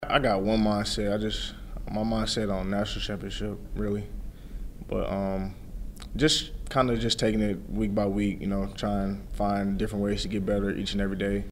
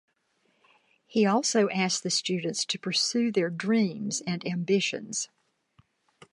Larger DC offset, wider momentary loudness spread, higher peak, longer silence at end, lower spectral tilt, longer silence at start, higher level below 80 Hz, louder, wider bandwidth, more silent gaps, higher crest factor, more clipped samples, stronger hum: neither; first, 13 LU vs 8 LU; first, -6 dBFS vs -12 dBFS; second, 0 s vs 1.1 s; first, -5 dB/octave vs -3.5 dB/octave; second, 0 s vs 1.1 s; first, -38 dBFS vs -78 dBFS; about the same, -28 LUFS vs -27 LUFS; first, 16 kHz vs 11.5 kHz; neither; about the same, 22 dB vs 18 dB; neither; neither